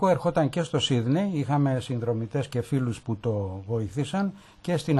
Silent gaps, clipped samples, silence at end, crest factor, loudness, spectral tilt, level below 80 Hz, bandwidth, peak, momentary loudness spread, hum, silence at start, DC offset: none; under 0.1%; 0 s; 16 dB; -27 LUFS; -6.5 dB/octave; -56 dBFS; 12 kHz; -10 dBFS; 7 LU; none; 0 s; under 0.1%